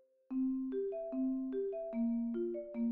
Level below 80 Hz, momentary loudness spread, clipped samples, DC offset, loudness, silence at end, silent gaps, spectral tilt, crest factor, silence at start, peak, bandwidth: -68 dBFS; 3 LU; under 0.1%; under 0.1%; -38 LUFS; 0 s; none; -9 dB/octave; 10 dB; 0.3 s; -28 dBFS; 3.7 kHz